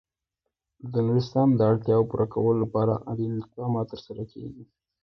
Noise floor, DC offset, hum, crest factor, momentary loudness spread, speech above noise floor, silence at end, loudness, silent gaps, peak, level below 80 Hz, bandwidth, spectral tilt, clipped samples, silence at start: -84 dBFS; under 0.1%; none; 16 dB; 17 LU; 59 dB; 0.4 s; -25 LUFS; none; -10 dBFS; -58 dBFS; 6.2 kHz; -10 dB/octave; under 0.1%; 0.85 s